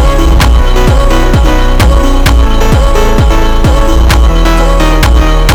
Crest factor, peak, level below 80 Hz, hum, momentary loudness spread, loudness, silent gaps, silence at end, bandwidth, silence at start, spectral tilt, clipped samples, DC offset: 4 dB; 0 dBFS; -6 dBFS; none; 2 LU; -8 LUFS; none; 0 s; 17.5 kHz; 0 s; -5.5 dB/octave; under 0.1%; under 0.1%